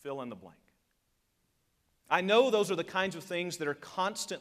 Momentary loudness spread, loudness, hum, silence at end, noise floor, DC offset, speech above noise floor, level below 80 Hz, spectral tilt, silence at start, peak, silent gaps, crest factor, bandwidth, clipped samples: 15 LU; -31 LUFS; none; 0 s; -77 dBFS; under 0.1%; 45 dB; -78 dBFS; -3.5 dB/octave; 0.05 s; -12 dBFS; none; 22 dB; 15.5 kHz; under 0.1%